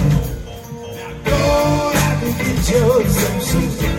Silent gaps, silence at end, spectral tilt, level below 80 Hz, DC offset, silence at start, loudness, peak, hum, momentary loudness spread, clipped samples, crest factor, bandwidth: none; 0 s; -5.5 dB/octave; -26 dBFS; under 0.1%; 0 s; -17 LUFS; -2 dBFS; none; 16 LU; under 0.1%; 14 dB; 17 kHz